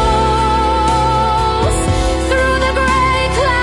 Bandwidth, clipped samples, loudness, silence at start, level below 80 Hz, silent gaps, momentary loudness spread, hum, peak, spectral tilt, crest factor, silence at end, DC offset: 11.5 kHz; under 0.1%; -14 LUFS; 0 s; -20 dBFS; none; 2 LU; none; -4 dBFS; -5 dB/octave; 10 dB; 0 s; under 0.1%